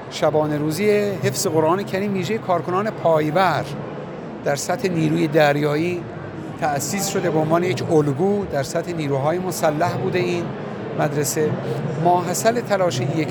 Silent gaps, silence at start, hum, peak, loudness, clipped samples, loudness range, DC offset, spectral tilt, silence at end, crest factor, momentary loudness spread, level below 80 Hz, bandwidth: none; 0 s; none; -4 dBFS; -21 LUFS; under 0.1%; 2 LU; under 0.1%; -5.5 dB/octave; 0 s; 16 dB; 8 LU; -54 dBFS; 19 kHz